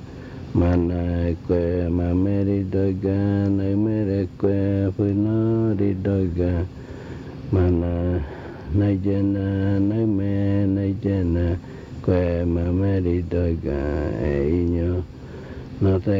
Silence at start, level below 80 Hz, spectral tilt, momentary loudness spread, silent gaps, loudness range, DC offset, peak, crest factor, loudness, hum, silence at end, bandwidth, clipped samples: 0 s; -40 dBFS; -10.5 dB/octave; 10 LU; none; 2 LU; under 0.1%; -8 dBFS; 14 dB; -22 LUFS; none; 0 s; 5.6 kHz; under 0.1%